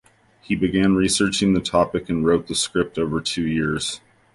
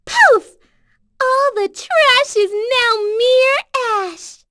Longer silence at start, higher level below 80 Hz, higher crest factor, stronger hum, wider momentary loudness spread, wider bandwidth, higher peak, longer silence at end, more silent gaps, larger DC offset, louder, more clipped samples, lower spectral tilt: first, 0.5 s vs 0.05 s; first, -44 dBFS vs -60 dBFS; about the same, 16 dB vs 16 dB; neither; second, 6 LU vs 10 LU; about the same, 11.5 kHz vs 11 kHz; second, -4 dBFS vs 0 dBFS; first, 0.35 s vs 0.2 s; neither; neither; second, -21 LUFS vs -14 LUFS; neither; first, -4.5 dB/octave vs 0 dB/octave